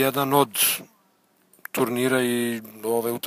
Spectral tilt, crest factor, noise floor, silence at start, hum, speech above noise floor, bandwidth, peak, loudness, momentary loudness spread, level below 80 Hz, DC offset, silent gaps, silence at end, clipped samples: -3.5 dB/octave; 18 dB; -63 dBFS; 0 s; none; 40 dB; 16 kHz; -6 dBFS; -23 LUFS; 11 LU; -70 dBFS; under 0.1%; none; 0 s; under 0.1%